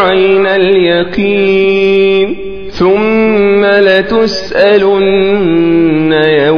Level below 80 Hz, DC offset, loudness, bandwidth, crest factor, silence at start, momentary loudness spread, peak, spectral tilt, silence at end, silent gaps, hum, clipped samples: -38 dBFS; 3%; -9 LUFS; 5.4 kHz; 8 dB; 0 s; 4 LU; 0 dBFS; -6.5 dB/octave; 0 s; none; none; 0.3%